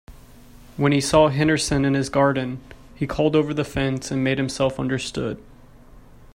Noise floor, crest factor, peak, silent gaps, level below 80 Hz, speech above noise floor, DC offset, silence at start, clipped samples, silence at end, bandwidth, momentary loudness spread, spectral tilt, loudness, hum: -46 dBFS; 20 dB; -4 dBFS; none; -44 dBFS; 25 dB; under 0.1%; 0.1 s; under 0.1%; 0.1 s; 16 kHz; 13 LU; -5.5 dB/octave; -21 LUFS; none